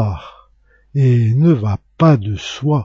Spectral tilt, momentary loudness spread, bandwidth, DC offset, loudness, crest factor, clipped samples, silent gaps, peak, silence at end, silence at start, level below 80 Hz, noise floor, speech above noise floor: -8 dB/octave; 10 LU; 7.4 kHz; under 0.1%; -15 LUFS; 14 dB; under 0.1%; none; 0 dBFS; 0 s; 0 s; -44 dBFS; -53 dBFS; 39 dB